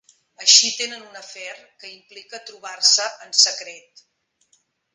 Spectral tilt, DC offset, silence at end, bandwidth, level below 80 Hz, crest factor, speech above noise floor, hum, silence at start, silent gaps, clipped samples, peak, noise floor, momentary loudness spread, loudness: 3.5 dB/octave; under 0.1%; 1.15 s; 10.5 kHz; -86 dBFS; 24 dB; 43 dB; none; 0.4 s; none; under 0.1%; 0 dBFS; -65 dBFS; 25 LU; -16 LUFS